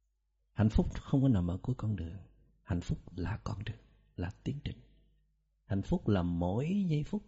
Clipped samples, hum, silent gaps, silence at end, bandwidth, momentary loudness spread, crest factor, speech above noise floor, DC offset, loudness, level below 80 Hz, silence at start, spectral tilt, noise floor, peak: under 0.1%; none; none; 0.05 s; 8 kHz; 15 LU; 18 dB; 45 dB; under 0.1%; -34 LUFS; -46 dBFS; 0.55 s; -8.5 dB/octave; -78 dBFS; -16 dBFS